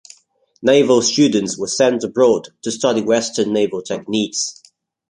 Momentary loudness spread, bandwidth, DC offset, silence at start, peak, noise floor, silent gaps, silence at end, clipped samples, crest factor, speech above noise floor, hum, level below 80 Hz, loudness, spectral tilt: 9 LU; 11 kHz; under 0.1%; 0.6 s; -2 dBFS; -56 dBFS; none; 0.6 s; under 0.1%; 16 dB; 40 dB; none; -62 dBFS; -17 LUFS; -3.5 dB/octave